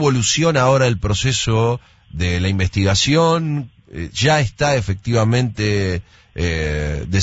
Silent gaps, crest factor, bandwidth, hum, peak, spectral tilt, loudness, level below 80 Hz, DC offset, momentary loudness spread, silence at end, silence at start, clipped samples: none; 14 dB; 8 kHz; none; -2 dBFS; -5 dB/octave; -18 LUFS; -34 dBFS; under 0.1%; 12 LU; 0 s; 0 s; under 0.1%